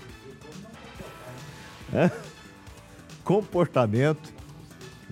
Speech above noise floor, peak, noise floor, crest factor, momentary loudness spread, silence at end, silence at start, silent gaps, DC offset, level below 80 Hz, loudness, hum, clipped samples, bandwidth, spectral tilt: 23 dB; -8 dBFS; -47 dBFS; 22 dB; 23 LU; 0.05 s; 0 s; none; under 0.1%; -56 dBFS; -25 LUFS; none; under 0.1%; 16 kHz; -7.5 dB/octave